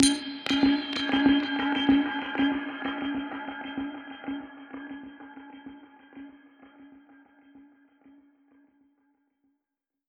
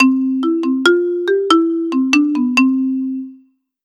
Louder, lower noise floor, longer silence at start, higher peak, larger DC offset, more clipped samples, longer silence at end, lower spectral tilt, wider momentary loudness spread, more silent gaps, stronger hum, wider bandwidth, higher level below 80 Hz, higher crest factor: second, -27 LUFS vs -15 LUFS; first, -87 dBFS vs -50 dBFS; about the same, 0 s vs 0 s; second, -4 dBFS vs 0 dBFS; neither; neither; first, 2.5 s vs 0.5 s; about the same, -2.5 dB/octave vs -3 dB/octave; first, 23 LU vs 8 LU; neither; neither; about the same, 12 kHz vs 11 kHz; first, -58 dBFS vs -78 dBFS; first, 28 dB vs 14 dB